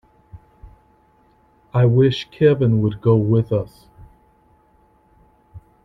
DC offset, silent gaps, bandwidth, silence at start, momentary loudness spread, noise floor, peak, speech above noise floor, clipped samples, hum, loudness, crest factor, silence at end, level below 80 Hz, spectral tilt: under 0.1%; none; 6 kHz; 0.35 s; 9 LU; -56 dBFS; -4 dBFS; 40 dB; under 0.1%; none; -18 LUFS; 18 dB; 0.25 s; -48 dBFS; -9 dB/octave